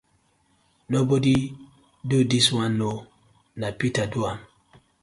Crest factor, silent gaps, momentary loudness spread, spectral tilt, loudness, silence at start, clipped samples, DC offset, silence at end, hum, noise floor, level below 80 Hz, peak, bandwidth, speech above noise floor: 18 dB; none; 17 LU; -5 dB/octave; -24 LUFS; 0.9 s; under 0.1%; under 0.1%; 0.6 s; none; -65 dBFS; -54 dBFS; -6 dBFS; 11.5 kHz; 43 dB